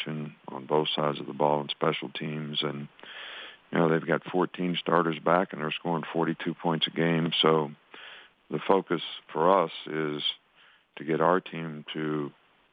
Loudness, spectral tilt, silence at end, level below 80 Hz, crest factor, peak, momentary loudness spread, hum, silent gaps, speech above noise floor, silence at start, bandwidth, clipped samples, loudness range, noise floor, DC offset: -28 LUFS; -8.5 dB/octave; 0.4 s; -80 dBFS; 22 dB; -6 dBFS; 16 LU; none; none; 33 dB; 0 s; 5 kHz; under 0.1%; 3 LU; -60 dBFS; under 0.1%